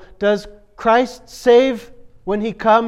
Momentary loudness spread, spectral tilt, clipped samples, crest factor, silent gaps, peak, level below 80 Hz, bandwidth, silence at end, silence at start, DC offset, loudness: 12 LU; -5 dB/octave; under 0.1%; 16 dB; none; -2 dBFS; -46 dBFS; 13 kHz; 0 s; 0.2 s; under 0.1%; -17 LUFS